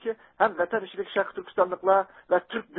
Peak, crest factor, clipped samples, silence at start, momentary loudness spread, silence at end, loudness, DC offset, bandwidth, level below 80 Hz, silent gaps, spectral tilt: -6 dBFS; 20 dB; under 0.1%; 0.05 s; 7 LU; 0 s; -27 LUFS; under 0.1%; 4.2 kHz; -70 dBFS; none; -8.5 dB/octave